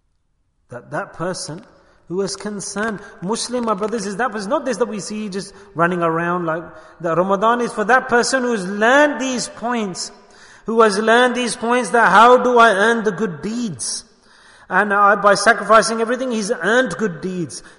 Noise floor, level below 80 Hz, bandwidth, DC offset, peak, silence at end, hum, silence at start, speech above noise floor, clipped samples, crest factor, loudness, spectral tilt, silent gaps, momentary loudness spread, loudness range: -64 dBFS; -56 dBFS; 11 kHz; under 0.1%; 0 dBFS; 0.1 s; none; 0.7 s; 47 dB; under 0.1%; 18 dB; -17 LUFS; -4 dB/octave; none; 15 LU; 10 LU